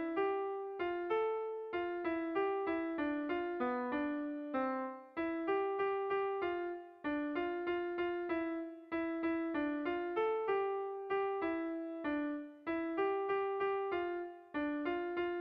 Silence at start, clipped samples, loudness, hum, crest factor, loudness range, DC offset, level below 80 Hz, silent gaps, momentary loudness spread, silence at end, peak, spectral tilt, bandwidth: 0 s; under 0.1%; -38 LUFS; none; 12 dB; 1 LU; under 0.1%; -72 dBFS; none; 5 LU; 0 s; -24 dBFS; -7.5 dB/octave; 5.2 kHz